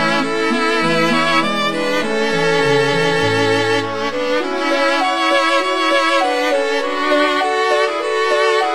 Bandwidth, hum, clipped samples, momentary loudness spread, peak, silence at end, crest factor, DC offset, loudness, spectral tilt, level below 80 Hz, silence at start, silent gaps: 17.5 kHz; none; under 0.1%; 4 LU; -2 dBFS; 0 s; 14 dB; 3%; -15 LUFS; -4 dB/octave; -58 dBFS; 0 s; none